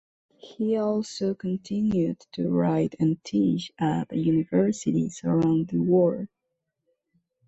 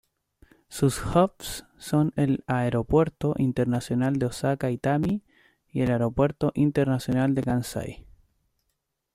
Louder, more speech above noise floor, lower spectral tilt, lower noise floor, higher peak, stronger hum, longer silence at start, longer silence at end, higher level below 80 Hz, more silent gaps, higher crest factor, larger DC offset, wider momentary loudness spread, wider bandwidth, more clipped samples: about the same, -25 LUFS vs -26 LUFS; about the same, 57 dB vs 54 dB; about the same, -7.5 dB/octave vs -7 dB/octave; about the same, -81 dBFS vs -78 dBFS; about the same, -10 dBFS vs -8 dBFS; neither; second, 0.45 s vs 0.7 s; about the same, 1.2 s vs 1.15 s; second, -60 dBFS vs -48 dBFS; neither; about the same, 16 dB vs 18 dB; neither; second, 7 LU vs 10 LU; second, 8.2 kHz vs 15.5 kHz; neither